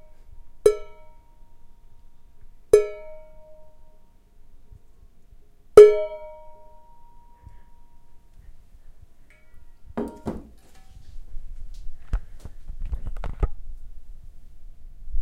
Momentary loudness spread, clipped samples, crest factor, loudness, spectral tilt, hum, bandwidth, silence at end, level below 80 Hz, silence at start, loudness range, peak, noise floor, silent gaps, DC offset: 32 LU; under 0.1%; 26 dB; -20 LUFS; -6 dB/octave; none; 12.5 kHz; 0 s; -38 dBFS; 0.25 s; 20 LU; 0 dBFS; -49 dBFS; none; under 0.1%